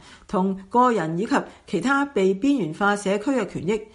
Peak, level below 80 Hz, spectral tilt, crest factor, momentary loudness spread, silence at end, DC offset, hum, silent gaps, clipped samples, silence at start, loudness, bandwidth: -6 dBFS; -56 dBFS; -6 dB/octave; 16 dB; 6 LU; 0.1 s; under 0.1%; none; none; under 0.1%; 0.1 s; -23 LUFS; 11.5 kHz